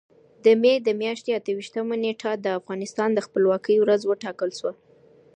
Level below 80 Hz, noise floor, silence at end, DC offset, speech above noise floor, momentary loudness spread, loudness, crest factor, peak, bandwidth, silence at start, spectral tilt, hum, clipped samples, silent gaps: -78 dBFS; -54 dBFS; 0.65 s; under 0.1%; 32 dB; 10 LU; -23 LUFS; 18 dB; -6 dBFS; 9.4 kHz; 0.45 s; -5 dB/octave; none; under 0.1%; none